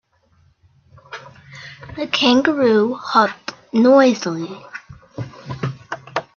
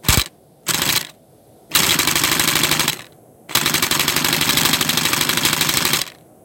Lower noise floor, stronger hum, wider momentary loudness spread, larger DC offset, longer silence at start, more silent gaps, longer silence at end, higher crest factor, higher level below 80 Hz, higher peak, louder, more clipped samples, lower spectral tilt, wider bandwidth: first, -57 dBFS vs -49 dBFS; neither; first, 23 LU vs 7 LU; neither; first, 1.1 s vs 0.05 s; neither; second, 0.15 s vs 0.3 s; about the same, 18 dB vs 18 dB; second, -58 dBFS vs -40 dBFS; about the same, 0 dBFS vs -2 dBFS; about the same, -17 LUFS vs -16 LUFS; neither; first, -5 dB/octave vs -1.5 dB/octave; second, 7 kHz vs 18 kHz